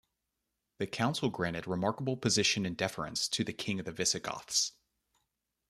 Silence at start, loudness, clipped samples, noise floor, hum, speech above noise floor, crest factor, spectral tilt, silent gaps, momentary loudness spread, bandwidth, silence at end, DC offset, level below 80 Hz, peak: 0.8 s; -32 LUFS; under 0.1%; -85 dBFS; none; 52 dB; 20 dB; -3 dB/octave; none; 8 LU; 14 kHz; 1 s; under 0.1%; -66 dBFS; -14 dBFS